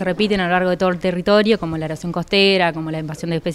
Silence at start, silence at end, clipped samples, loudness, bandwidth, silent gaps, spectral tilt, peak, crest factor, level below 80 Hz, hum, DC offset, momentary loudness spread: 0 s; 0 s; under 0.1%; -18 LUFS; 13 kHz; none; -6 dB/octave; -2 dBFS; 16 dB; -46 dBFS; none; under 0.1%; 10 LU